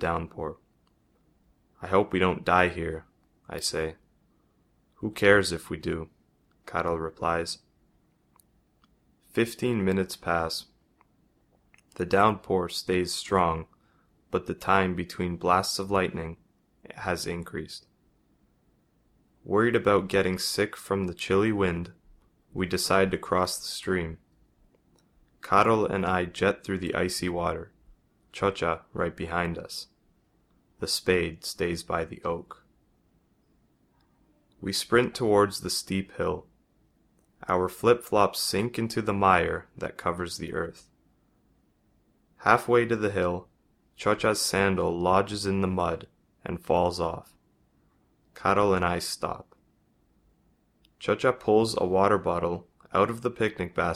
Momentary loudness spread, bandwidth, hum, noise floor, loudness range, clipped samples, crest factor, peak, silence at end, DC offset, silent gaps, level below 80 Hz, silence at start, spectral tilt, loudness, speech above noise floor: 14 LU; 15.5 kHz; none; -67 dBFS; 5 LU; under 0.1%; 26 dB; -4 dBFS; 0 s; under 0.1%; none; -54 dBFS; 0 s; -4.5 dB/octave; -27 LUFS; 41 dB